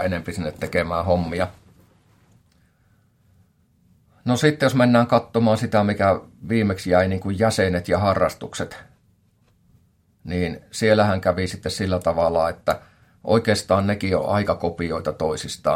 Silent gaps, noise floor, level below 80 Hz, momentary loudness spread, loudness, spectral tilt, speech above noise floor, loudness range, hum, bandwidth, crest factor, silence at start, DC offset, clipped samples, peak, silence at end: none; -61 dBFS; -52 dBFS; 11 LU; -21 LUFS; -6 dB/octave; 40 dB; 8 LU; none; 16.5 kHz; 20 dB; 0 s; under 0.1%; under 0.1%; -2 dBFS; 0 s